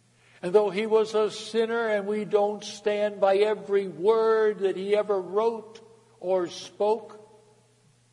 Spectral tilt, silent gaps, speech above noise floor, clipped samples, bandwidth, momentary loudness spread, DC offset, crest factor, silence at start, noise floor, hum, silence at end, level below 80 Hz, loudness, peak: -5 dB/octave; none; 37 dB; under 0.1%; 11 kHz; 6 LU; under 0.1%; 18 dB; 0.45 s; -62 dBFS; none; 0.9 s; -80 dBFS; -26 LUFS; -8 dBFS